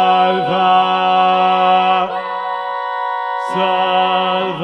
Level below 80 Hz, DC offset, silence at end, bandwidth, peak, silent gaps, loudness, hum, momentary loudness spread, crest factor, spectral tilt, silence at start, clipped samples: -68 dBFS; under 0.1%; 0 s; 8.4 kHz; -2 dBFS; none; -15 LUFS; none; 9 LU; 12 dB; -5.5 dB/octave; 0 s; under 0.1%